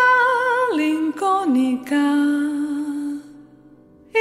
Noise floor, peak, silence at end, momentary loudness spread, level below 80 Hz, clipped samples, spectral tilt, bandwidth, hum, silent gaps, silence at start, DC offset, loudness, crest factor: -49 dBFS; -6 dBFS; 0 s; 9 LU; -66 dBFS; under 0.1%; -4 dB/octave; 13.5 kHz; none; none; 0 s; under 0.1%; -20 LUFS; 14 dB